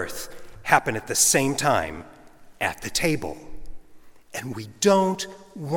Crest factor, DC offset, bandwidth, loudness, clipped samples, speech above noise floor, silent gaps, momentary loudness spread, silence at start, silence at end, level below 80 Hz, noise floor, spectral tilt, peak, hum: 26 dB; under 0.1%; 17.5 kHz; -23 LUFS; under 0.1%; 22 dB; none; 18 LU; 0 s; 0 s; -48 dBFS; -46 dBFS; -3 dB/octave; 0 dBFS; none